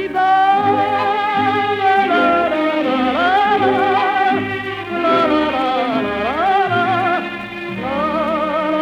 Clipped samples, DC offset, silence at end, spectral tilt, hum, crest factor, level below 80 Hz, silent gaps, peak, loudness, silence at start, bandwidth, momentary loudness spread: under 0.1%; under 0.1%; 0 s; -6 dB/octave; none; 12 dB; -50 dBFS; none; -4 dBFS; -16 LUFS; 0 s; 10 kHz; 7 LU